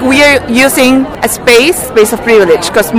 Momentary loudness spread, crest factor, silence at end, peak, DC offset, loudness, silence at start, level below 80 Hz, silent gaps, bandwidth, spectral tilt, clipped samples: 4 LU; 8 dB; 0 s; 0 dBFS; under 0.1%; -7 LUFS; 0 s; -34 dBFS; none; 17.5 kHz; -3 dB/octave; 1%